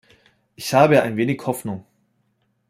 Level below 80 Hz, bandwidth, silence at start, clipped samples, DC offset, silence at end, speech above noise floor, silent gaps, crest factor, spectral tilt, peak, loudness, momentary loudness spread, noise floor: -62 dBFS; 16 kHz; 0.6 s; under 0.1%; under 0.1%; 0.9 s; 49 dB; none; 20 dB; -6 dB/octave; -2 dBFS; -19 LUFS; 17 LU; -68 dBFS